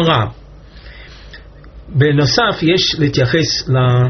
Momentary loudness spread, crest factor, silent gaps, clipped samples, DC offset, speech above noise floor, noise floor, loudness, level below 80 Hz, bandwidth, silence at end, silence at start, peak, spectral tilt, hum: 8 LU; 16 dB; none; under 0.1%; under 0.1%; 24 dB; -37 dBFS; -14 LUFS; -38 dBFS; 6.4 kHz; 0 s; 0 s; 0 dBFS; -4.5 dB/octave; none